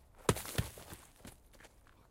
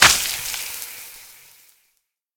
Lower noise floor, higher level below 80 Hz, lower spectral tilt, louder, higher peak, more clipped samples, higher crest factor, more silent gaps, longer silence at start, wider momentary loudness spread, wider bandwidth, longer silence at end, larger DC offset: second, -61 dBFS vs -71 dBFS; second, -54 dBFS vs -48 dBFS; first, -4.5 dB/octave vs 0.5 dB/octave; second, -39 LUFS vs -21 LUFS; second, -10 dBFS vs 0 dBFS; neither; first, 32 dB vs 24 dB; neither; first, 0.15 s vs 0 s; about the same, 24 LU vs 23 LU; second, 17 kHz vs over 20 kHz; second, 0.45 s vs 1.1 s; neither